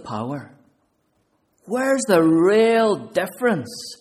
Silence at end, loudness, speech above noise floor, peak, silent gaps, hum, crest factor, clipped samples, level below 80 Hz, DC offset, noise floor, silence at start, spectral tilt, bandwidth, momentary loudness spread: 0.05 s; -19 LUFS; 48 dB; -4 dBFS; none; none; 16 dB; under 0.1%; -66 dBFS; under 0.1%; -67 dBFS; 0.05 s; -5 dB/octave; 15.5 kHz; 14 LU